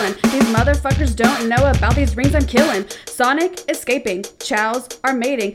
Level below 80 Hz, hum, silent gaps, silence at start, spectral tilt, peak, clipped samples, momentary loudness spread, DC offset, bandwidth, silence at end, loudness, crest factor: -26 dBFS; none; none; 0 s; -5 dB/octave; 0 dBFS; under 0.1%; 6 LU; under 0.1%; 16 kHz; 0 s; -17 LUFS; 16 dB